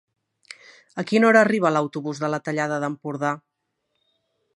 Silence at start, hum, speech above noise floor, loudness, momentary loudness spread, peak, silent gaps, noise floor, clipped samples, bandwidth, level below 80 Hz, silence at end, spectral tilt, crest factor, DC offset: 0.95 s; none; 55 dB; -22 LUFS; 20 LU; -2 dBFS; none; -77 dBFS; under 0.1%; 11 kHz; -76 dBFS; 1.15 s; -6 dB/octave; 22 dB; under 0.1%